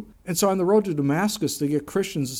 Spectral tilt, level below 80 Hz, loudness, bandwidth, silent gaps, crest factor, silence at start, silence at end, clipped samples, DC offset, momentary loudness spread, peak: -5 dB/octave; -56 dBFS; -23 LUFS; 17.5 kHz; none; 14 dB; 0 s; 0 s; under 0.1%; under 0.1%; 5 LU; -8 dBFS